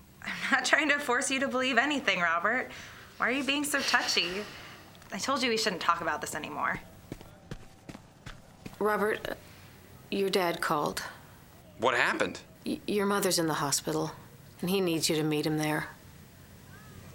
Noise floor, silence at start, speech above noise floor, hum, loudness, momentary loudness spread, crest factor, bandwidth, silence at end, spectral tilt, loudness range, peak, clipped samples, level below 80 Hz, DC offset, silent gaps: -53 dBFS; 0.2 s; 24 dB; none; -29 LUFS; 22 LU; 24 dB; 17 kHz; 0 s; -3 dB/octave; 7 LU; -8 dBFS; under 0.1%; -60 dBFS; under 0.1%; none